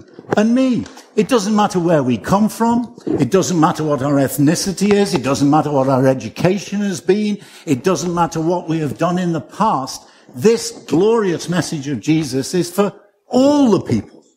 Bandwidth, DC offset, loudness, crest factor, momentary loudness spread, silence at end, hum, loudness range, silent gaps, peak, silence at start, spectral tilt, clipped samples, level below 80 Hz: 16 kHz; under 0.1%; -17 LUFS; 16 dB; 8 LU; 0.3 s; none; 3 LU; none; 0 dBFS; 0.3 s; -6 dB/octave; under 0.1%; -50 dBFS